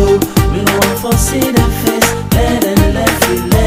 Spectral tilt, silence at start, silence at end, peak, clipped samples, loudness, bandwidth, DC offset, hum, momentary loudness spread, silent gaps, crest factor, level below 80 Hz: -5 dB/octave; 0 s; 0 s; 0 dBFS; under 0.1%; -12 LUFS; 16.5 kHz; under 0.1%; none; 2 LU; none; 12 dB; -20 dBFS